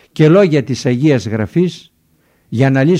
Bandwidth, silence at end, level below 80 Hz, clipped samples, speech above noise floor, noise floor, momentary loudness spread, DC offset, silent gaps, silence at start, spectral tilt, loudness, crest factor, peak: 10.5 kHz; 0 s; -52 dBFS; under 0.1%; 44 dB; -56 dBFS; 8 LU; under 0.1%; none; 0.15 s; -7.5 dB/octave; -13 LUFS; 14 dB; 0 dBFS